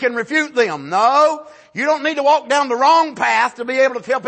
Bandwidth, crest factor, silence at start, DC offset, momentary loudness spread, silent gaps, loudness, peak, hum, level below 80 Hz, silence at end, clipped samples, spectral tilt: 8.8 kHz; 14 dB; 0 s; under 0.1%; 6 LU; none; -16 LUFS; -2 dBFS; none; -72 dBFS; 0 s; under 0.1%; -3 dB/octave